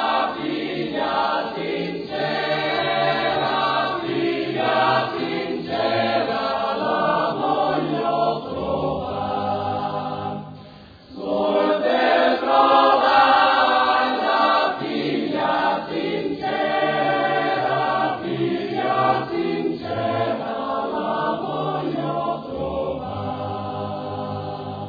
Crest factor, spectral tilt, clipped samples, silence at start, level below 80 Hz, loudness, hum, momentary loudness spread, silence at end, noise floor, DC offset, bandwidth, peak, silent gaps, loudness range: 18 dB; -7 dB/octave; under 0.1%; 0 s; -54 dBFS; -21 LUFS; none; 10 LU; 0 s; -43 dBFS; under 0.1%; 5 kHz; -4 dBFS; none; 8 LU